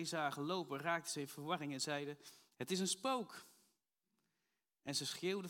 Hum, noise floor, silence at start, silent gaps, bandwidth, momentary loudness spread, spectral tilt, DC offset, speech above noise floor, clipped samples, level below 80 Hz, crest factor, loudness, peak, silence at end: none; -89 dBFS; 0 s; none; 17.5 kHz; 13 LU; -3.5 dB/octave; under 0.1%; 46 dB; under 0.1%; under -90 dBFS; 20 dB; -42 LUFS; -24 dBFS; 0 s